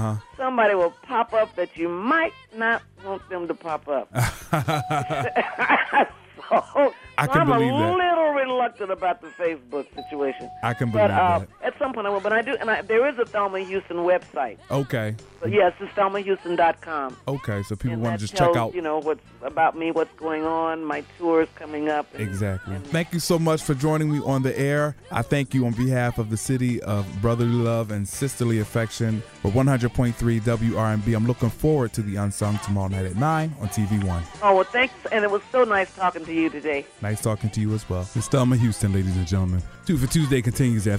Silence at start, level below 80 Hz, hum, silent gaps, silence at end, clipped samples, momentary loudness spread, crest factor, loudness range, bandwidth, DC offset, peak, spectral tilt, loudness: 0 s; -46 dBFS; none; none; 0 s; under 0.1%; 8 LU; 20 dB; 3 LU; 16 kHz; under 0.1%; -4 dBFS; -6 dB/octave; -23 LUFS